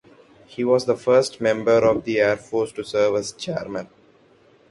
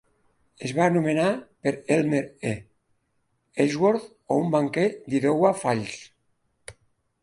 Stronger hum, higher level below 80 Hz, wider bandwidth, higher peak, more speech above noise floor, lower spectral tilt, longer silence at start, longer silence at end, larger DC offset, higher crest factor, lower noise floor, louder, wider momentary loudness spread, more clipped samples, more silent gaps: neither; first, -58 dBFS vs -64 dBFS; about the same, 11.5 kHz vs 11.5 kHz; about the same, -4 dBFS vs -6 dBFS; second, 34 dB vs 48 dB; second, -5 dB/octave vs -6.5 dB/octave; about the same, 0.6 s vs 0.6 s; first, 0.85 s vs 0.5 s; neither; about the same, 18 dB vs 20 dB; second, -55 dBFS vs -72 dBFS; first, -21 LUFS vs -24 LUFS; about the same, 11 LU vs 10 LU; neither; neither